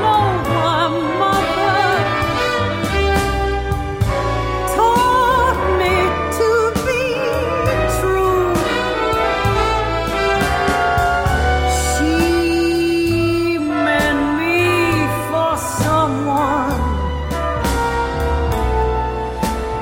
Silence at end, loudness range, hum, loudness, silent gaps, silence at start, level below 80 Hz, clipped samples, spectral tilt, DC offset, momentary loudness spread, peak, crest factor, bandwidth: 0 s; 2 LU; none; -17 LUFS; none; 0 s; -26 dBFS; under 0.1%; -5 dB/octave; under 0.1%; 5 LU; -4 dBFS; 14 dB; 16.5 kHz